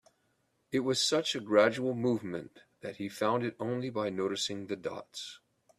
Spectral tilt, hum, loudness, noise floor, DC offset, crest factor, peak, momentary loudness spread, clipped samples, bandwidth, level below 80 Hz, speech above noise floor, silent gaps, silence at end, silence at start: -4 dB/octave; none; -32 LUFS; -75 dBFS; under 0.1%; 22 dB; -10 dBFS; 16 LU; under 0.1%; 14.5 kHz; -74 dBFS; 43 dB; none; 0.4 s; 0.7 s